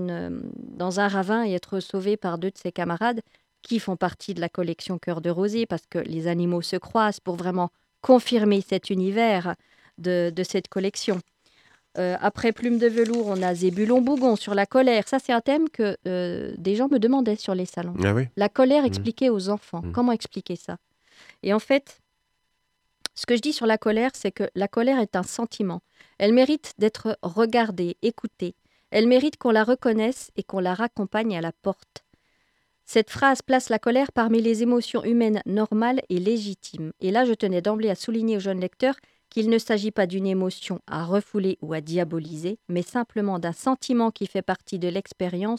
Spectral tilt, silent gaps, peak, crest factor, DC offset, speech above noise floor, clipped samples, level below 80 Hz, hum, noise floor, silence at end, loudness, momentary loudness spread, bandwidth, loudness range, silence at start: -6 dB/octave; none; -4 dBFS; 20 dB; under 0.1%; 50 dB; under 0.1%; -62 dBFS; none; -73 dBFS; 0 s; -24 LUFS; 10 LU; 13 kHz; 5 LU; 0 s